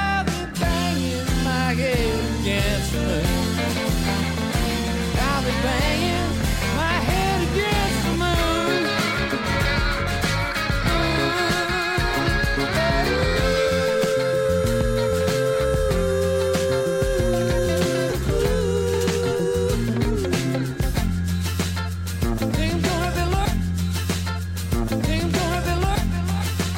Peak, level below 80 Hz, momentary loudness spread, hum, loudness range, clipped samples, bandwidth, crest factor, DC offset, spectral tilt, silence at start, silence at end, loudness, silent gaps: -8 dBFS; -30 dBFS; 4 LU; none; 3 LU; under 0.1%; 17 kHz; 14 dB; under 0.1%; -5 dB/octave; 0 s; 0 s; -22 LUFS; none